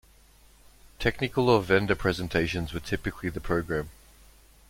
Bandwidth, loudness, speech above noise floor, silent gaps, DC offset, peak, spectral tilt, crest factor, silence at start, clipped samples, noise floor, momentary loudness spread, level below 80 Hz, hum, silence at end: 16.5 kHz; -27 LUFS; 30 dB; none; under 0.1%; -8 dBFS; -6 dB/octave; 22 dB; 0.85 s; under 0.1%; -57 dBFS; 10 LU; -46 dBFS; none; 0.8 s